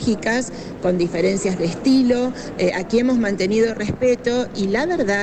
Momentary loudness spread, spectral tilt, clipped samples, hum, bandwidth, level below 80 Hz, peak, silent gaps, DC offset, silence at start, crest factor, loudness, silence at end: 5 LU; -5.5 dB/octave; under 0.1%; none; 9.2 kHz; -44 dBFS; -8 dBFS; none; under 0.1%; 0 s; 12 dB; -20 LUFS; 0 s